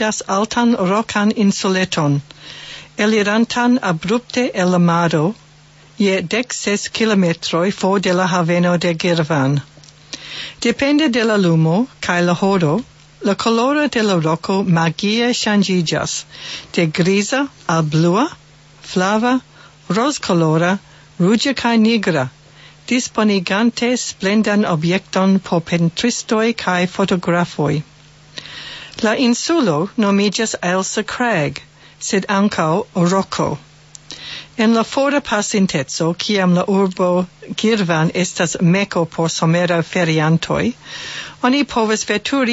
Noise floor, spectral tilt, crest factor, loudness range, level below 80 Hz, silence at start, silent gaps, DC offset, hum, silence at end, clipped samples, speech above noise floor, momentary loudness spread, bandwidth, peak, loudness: -46 dBFS; -5 dB/octave; 16 dB; 2 LU; -52 dBFS; 0 s; none; under 0.1%; none; 0 s; under 0.1%; 30 dB; 8 LU; 8 kHz; -2 dBFS; -17 LUFS